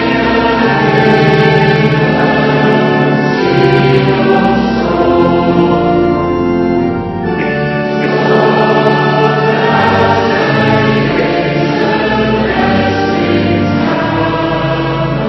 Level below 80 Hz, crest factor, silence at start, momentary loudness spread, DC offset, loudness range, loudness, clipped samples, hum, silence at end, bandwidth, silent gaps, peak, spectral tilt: -34 dBFS; 10 dB; 0 s; 5 LU; under 0.1%; 2 LU; -11 LUFS; 0.3%; none; 0 s; 6.2 kHz; none; 0 dBFS; -7.5 dB/octave